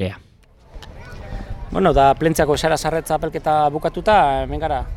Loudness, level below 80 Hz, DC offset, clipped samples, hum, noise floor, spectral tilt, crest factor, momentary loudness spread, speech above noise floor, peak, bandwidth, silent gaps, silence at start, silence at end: -18 LUFS; -32 dBFS; under 0.1%; under 0.1%; none; -49 dBFS; -5.5 dB/octave; 16 dB; 19 LU; 32 dB; -2 dBFS; 17 kHz; none; 0 s; 0 s